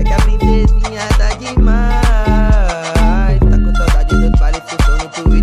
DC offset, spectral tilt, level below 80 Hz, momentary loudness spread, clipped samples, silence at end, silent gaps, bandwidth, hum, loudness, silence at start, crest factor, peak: under 0.1%; -6 dB/octave; -12 dBFS; 3 LU; under 0.1%; 0 s; none; 11 kHz; none; -14 LUFS; 0 s; 10 dB; 0 dBFS